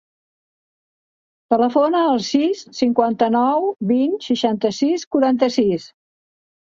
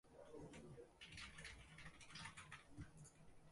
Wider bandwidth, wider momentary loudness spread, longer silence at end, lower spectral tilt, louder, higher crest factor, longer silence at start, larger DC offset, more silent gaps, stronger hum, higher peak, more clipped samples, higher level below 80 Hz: second, 7.6 kHz vs 11.5 kHz; about the same, 4 LU vs 6 LU; first, 0.8 s vs 0 s; first, -5.5 dB/octave vs -3.5 dB/octave; first, -18 LUFS vs -59 LUFS; about the same, 18 dB vs 18 dB; first, 1.5 s vs 0.05 s; neither; first, 5.07-5.11 s vs none; neither; first, -2 dBFS vs -42 dBFS; neither; first, -62 dBFS vs -70 dBFS